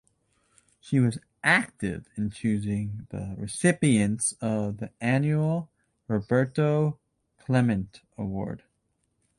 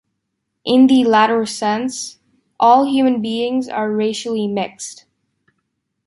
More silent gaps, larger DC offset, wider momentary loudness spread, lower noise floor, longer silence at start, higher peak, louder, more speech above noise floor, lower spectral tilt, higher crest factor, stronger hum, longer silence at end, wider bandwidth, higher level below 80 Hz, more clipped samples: neither; neither; about the same, 13 LU vs 15 LU; about the same, -74 dBFS vs -74 dBFS; first, 0.85 s vs 0.65 s; second, -8 dBFS vs -2 dBFS; second, -27 LUFS vs -16 LUFS; second, 49 dB vs 59 dB; first, -6 dB/octave vs -4.5 dB/octave; about the same, 20 dB vs 16 dB; neither; second, 0.8 s vs 1.15 s; about the same, 11.5 kHz vs 11.5 kHz; first, -54 dBFS vs -64 dBFS; neither